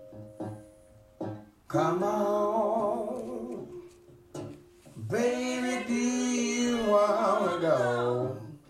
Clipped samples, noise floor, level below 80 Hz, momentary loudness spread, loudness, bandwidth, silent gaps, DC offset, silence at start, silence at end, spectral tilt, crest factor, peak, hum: under 0.1%; -56 dBFS; -64 dBFS; 18 LU; -28 LUFS; 14.5 kHz; none; under 0.1%; 0 s; 0.1 s; -5 dB/octave; 16 dB; -14 dBFS; none